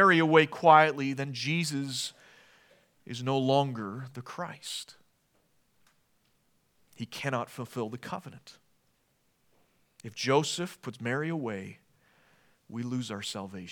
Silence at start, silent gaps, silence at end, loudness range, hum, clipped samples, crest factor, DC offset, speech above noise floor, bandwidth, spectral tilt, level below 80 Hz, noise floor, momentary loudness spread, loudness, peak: 0 s; none; 0 s; 13 LU; none; under 0.1%; 24 dB; under 0.1%; 43 dB; 18.5 kHz; -5 dB/octave; -80 dBFS; -72 dBFS; 20 LU; -29 LUFS; -6 dBFS